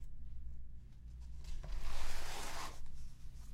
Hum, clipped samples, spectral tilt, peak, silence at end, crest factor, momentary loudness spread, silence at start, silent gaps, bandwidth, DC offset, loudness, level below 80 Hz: none; under 0.1%; -3 dB/octave; -24 dBFS; 0 s; 14 dB; 11 LU; 0 s; none; 12.5 kHz; under 0.1%; -50 LUFS; -44 dBFS